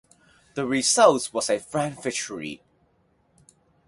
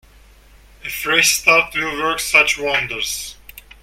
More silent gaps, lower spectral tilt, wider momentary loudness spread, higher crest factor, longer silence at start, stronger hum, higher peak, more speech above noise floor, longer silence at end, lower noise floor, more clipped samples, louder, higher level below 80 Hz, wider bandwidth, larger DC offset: neither; first, -3 dB/octave vs -0.5 dB/octave; first, 19 LU vs 15 LU; about the same, 22 dB vs 20 dB; second, 0.55 s vs 0.85 s; neither; second, -4 dBFS vs 0 dBFS; first, 42 dB vs 29 dB; first, 1.3 s vs 0.25 s; first, -65 dBFS vs -47 dBFS; neither; second, -23 LUFS vs -15 LUFS; second, -66 dBFS vs -46 dBFS; second, 11.5 kHz vs 16.5 kHz; neither